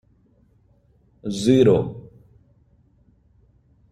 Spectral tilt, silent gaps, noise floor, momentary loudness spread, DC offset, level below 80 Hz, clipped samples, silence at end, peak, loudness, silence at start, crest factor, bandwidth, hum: -7 dB/octave; none; -59 dBFS; 20 LU; under 0.1%; -54 dBFS; under 0.1%; 1.9 s; -4 dBFS; -19 LUFS; 1.25 s; 22 dB; 11.5 kHz; none